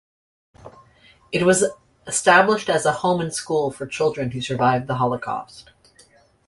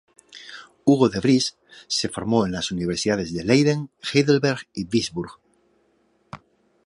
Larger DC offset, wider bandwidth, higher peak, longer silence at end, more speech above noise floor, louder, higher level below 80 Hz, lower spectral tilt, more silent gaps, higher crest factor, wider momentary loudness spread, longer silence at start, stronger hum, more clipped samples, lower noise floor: neither; about the same, 11.5 kHz vs 11.5 kHz; about the same, -2 dBFS vs -4 dBFS; first, 0.85 s vs 0.5 s; second, 34 dB vs 43 dB; about the same, -20 LUFS vs -22 LUFS; about the same, -56 dBFS vs -52 dBFS; about the same, -4 dB/octave vs -5 dB/octave; neither; about the same, 20 dB vs 20 dB; second, 12 LU vs 22 LU; first, 0.65 s vs 0.35 s; neither; neither; second, -55 dBFS vs -64 dBFS